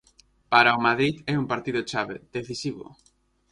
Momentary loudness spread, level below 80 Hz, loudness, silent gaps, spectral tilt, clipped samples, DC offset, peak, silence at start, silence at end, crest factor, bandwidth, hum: 15 LU; -60 dBFS; -24 LUFS; none; -5 dB/octave; under 0.1%; under 0.1%; -4 dBFS; 0.5 s; 0.7 s; 22 dB; 11.5 kHz; none